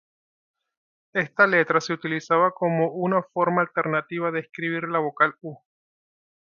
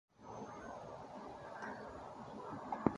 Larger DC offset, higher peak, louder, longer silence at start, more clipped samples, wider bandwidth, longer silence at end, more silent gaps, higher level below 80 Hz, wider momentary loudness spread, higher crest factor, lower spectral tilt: neither; first, -2 dBFS vs -14 dBFS; first, -23 LUFS vs -48 LUFS; first, 1.15 s vs 0.2 s; neither; second, 7.2 kHz vs 11.5 kHz; first, 0.9 s vs 0 s; neither; second, -74 dBFS vs -68 dBFS; first, 9 LU vs 5 LU; second, 22 dB vs 32 dB; about the same, -6 dB/octave vs -7 dB/octave